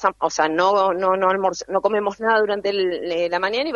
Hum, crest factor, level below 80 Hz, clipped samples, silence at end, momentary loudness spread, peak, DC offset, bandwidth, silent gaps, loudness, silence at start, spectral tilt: none; 18 dB; -58 dBFS; under 0.1%; 0 s; 5 LU; -2 dBFS; under 0.1%; 7.6 kHz; none; -20 LUFS; 0 s; -3.5 dB/octave